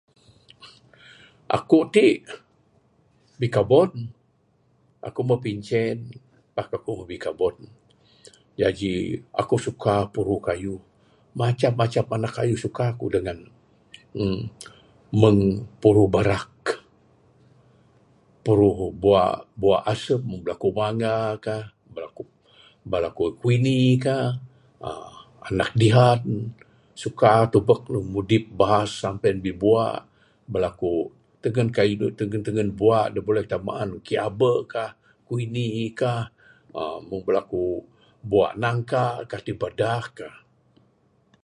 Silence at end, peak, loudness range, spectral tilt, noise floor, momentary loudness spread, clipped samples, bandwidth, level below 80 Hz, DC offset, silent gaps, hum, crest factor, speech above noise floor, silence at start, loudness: 1.15 s; -2 dBFS; 6 LU; -7 dB/octave; -64 dBFS; 17 LU; under 0.1%; 11 kHz; -50 dBFS; under 0.1%; none; none; 22 dB; 42 dB; 0.65 s; -23 LUFS